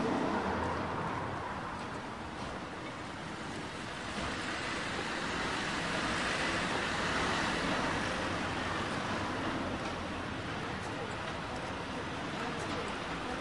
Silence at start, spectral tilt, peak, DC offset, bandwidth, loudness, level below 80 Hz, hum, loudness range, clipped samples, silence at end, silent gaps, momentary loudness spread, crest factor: 0 s; -4 dB/octave; -20 dBFS; under 0.1%; 11.5 kHz; -36 LUFS; -54 dBFS; none; 6 LU; under 0.1%; 0 s; none; 9 LU; 16 dB